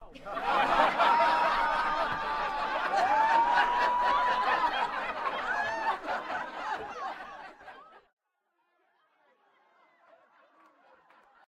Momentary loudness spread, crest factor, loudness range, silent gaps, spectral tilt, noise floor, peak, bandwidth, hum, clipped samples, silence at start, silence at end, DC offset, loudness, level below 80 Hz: 13 LU; 22 dB; 15 LU; none; -3 dB/octave; -79 dBFS; -10 dBFS; 13 kHz; none; under 0.1%; 0 s; 3.5 s; under 0.1%; -28 LUFS; -56 dBFS